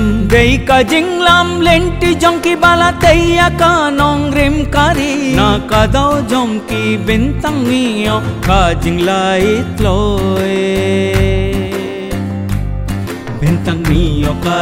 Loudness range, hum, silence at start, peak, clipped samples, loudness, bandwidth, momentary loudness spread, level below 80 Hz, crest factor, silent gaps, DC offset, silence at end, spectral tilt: 6 LU; none; 0 s; 0 dBFS; 0.1%; -12 LUFS; 16.5 kHz; 9 LU; -22 dBFS; 12 dB; none; 0.1%; 0 s; -5.5 dB/octave